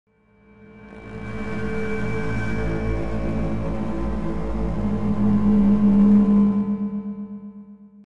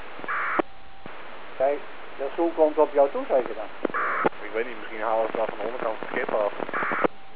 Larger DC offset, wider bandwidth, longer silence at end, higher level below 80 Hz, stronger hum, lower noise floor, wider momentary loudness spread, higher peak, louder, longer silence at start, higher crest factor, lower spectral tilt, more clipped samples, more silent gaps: second, under 0.1% vs 2%; first, 6.4 kHz vs 4 kHz; about the same, 0 s vs 0 s; first, -34 dBFS vs -66 dBFS; neither; first, -54 dBFS vs -45 dBFS; about the same, 18 LU vs 17 LU; about the same, -8 dBFS vs -6 dBFS; first, -22 LUFS vs -26 LUFS; about the same, 0.05 s vs 0 s; second, 14 dB vs 20 dB; about the same, -9.5 dB/octave vs -8.5 dB/octave; neither; neither